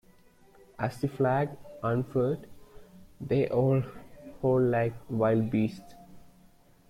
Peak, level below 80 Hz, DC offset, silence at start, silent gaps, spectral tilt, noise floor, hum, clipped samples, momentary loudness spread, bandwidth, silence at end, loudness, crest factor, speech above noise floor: -14 dBFS; -58 dBFS; under 0.1%; 0.8 s; none; -9 dB/octave; -59 dBFS; none; under 0.1%; 13 LU; 14 kHz; 0.7 s; -29 LUFS; 16 dB; 31 dB